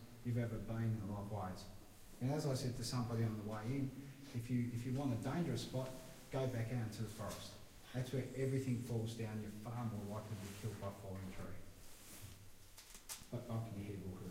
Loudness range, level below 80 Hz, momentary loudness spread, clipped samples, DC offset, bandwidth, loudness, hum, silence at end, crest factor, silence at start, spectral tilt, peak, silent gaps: 8 LU; -62 dBFS; 15 LU; under 0.1%; under 0.1%; 16 kHz; -44 LUFS; none; 0 s; 16 dB; 0 s; -6.5 dB/octave; -28 dBFS; none